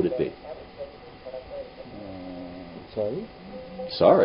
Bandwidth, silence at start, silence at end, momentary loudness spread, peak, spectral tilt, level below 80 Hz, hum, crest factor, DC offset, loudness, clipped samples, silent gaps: 5.4 kHz; 0 s; 0 s; 15 LU; -4 dBFS; -10.5 dB/octave; -56 dBFS; none; 24 dB; under 0.1%; -31 LUFS; under 0.1%; none